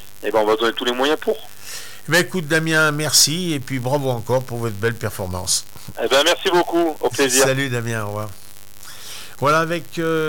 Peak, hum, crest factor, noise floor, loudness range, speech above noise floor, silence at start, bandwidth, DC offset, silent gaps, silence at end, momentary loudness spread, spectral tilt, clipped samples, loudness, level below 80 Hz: -4 dBFS; none; 16 dB; -43 dBFS; 2 LU; 23 dB; 0 s; 17.5 kHz; 2%; none; 0 s; 17 LU; -3 dB/octave; under 0.1%; -19 LUFS; -54 dBFS